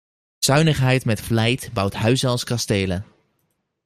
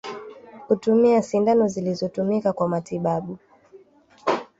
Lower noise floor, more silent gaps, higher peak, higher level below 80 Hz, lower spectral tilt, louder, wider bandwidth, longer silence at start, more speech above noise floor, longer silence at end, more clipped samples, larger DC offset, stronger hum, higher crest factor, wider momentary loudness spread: first, -71 dBFS vs -53 dBFS; neither; first, -2 dBFS vs -6 dBFS; first, -48 dBFS vs -62 dBFS; second, -5 dB/octave vs -7 dB/octave; about the same, -20 LUFS vs -22 LUFS; first, 15.5 kHz vs 8 kHz; first, 0.4 s vs 0.05 s; first, 52 dB vs 32 dB; first, 0.8 s vs 0.15 s; neither; neither; neither; about the same, 18 dB vs 16 dB; second, 6 LU vs 19 LU